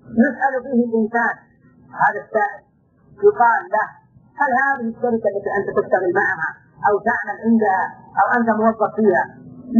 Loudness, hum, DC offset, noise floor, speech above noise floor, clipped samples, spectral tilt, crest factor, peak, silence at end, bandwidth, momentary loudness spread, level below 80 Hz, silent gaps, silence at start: -19 LUFS; none; under 0.1%; -52 dBFS; 34 dB; under 0.1%; -9.5 dB/octave; 16 dB; -4 dBFS; 0 s; 6.6 kHz; 7 LU; -60 dBFS; none; 0.1 s